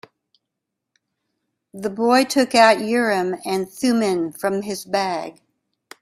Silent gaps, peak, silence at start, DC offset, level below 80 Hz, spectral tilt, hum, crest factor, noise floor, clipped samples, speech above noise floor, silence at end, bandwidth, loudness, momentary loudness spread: none; 0 dBFS; 1.75 s; under 0.1%; -64 dBFS; -4 dB/octave; none; 20 dB; -81 dBFS; under 0.1%; 62 dB; 0.7 s; 15.5 kHz; -19 LUFS; 13 LU